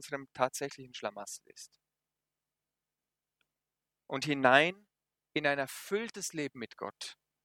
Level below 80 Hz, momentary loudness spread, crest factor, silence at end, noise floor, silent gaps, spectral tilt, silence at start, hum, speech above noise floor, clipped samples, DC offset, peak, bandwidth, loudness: -80 dBFS; 20 LU; 30 dB; 0.3 s; under -90 dBFS; none; -3.5 dB/octave; 0 s; none; over 56 dB; under 0.1%; under 0.1%; -6 dBFS; 18 kHz; -33 LUFS